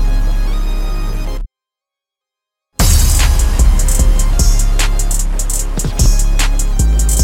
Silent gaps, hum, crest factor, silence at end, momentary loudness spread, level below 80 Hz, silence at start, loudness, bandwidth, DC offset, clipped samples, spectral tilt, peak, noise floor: none; none; 12 dB; 0 s; 10 LU; -12 dBFS; 0 s; -15 LUFS; 16.5 kHz; under 0.1%; under 0.1%; -3.5 dB/octave; 0 dBFS; -85 dBFS